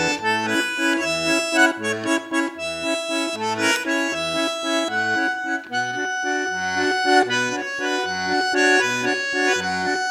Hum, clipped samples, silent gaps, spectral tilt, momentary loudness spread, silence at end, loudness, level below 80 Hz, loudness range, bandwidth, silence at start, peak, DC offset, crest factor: none; under 0.1%; none; -2.5 dB/octave; 7 LU; 0 s; -21 LUFS; -62 dBFS; 2 LU; 16 kHz; 0 s; -4 dBFS; under 0.1%; 18 dB